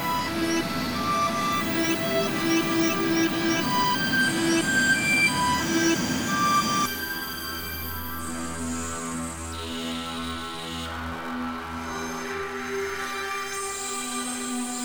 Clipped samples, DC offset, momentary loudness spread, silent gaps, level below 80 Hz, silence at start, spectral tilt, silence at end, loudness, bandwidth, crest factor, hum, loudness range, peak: under 0.1%; 0.3%; 11 LU; none; -50 dBFS; 0 s; -3 dB/octave; 0 s; -26 LUFS; over 20 kHz; 16 dB; none; 9 LU; -10 dBFS